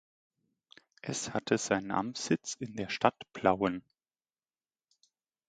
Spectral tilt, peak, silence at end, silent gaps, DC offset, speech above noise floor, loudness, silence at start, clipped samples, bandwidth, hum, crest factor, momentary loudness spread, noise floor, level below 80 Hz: -4 dB/octave; -8 dBFS; 1.7 s; none; under 0.1%; over 58 dB; -32 LUFS; 1.05 s; under 0.1%; 9.6 kHz; none; 28 dB; 9 LU; under -90 dBFS; -66 dBFS